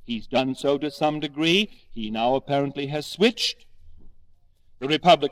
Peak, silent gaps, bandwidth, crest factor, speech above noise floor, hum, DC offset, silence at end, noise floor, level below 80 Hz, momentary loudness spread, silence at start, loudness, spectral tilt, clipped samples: -4 dBFS; none; 16 kHz; 20 dB; 30 dB; none; under 0.1%; 0 s; -53 dBFS; -50 dBFS; 10 LU; 0 s; -24 LUFS; -4.5 dB/octave; under 0.1%